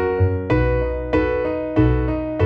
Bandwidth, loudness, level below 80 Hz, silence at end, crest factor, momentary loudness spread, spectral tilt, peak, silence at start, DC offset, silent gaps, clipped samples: 6 kHz; -20 LUFS; -26 dBFS; 0 s; 14 dB; 4 LU; -10 dB/octave; -4 dBFS; 0 s; under 0.1%; none; under 0.1%